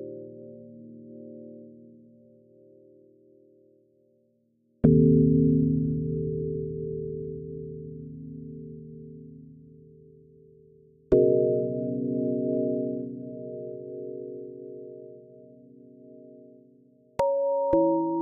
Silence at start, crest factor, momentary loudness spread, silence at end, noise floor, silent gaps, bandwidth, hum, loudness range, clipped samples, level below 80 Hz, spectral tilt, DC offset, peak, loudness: 0 s; 24 dB; 25 LU; 0 s; -68 dBFS; none; 3.3 kHz; none; 19 LU; under 0.1%; -52 dBFS; -10.5 dB/octave; under 0.1%; -4 dBFS; -26 LUFS